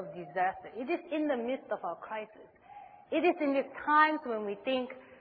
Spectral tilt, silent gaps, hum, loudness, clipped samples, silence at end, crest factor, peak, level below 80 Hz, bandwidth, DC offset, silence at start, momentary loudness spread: -7.5 dB/octave; none; none; -32 LUFS; under 0.1%; 0.05 s; 22 dB; -12 dBFS; -76 dBFS; 4.9 kHz; under 0.1%; 0 s; 16 LU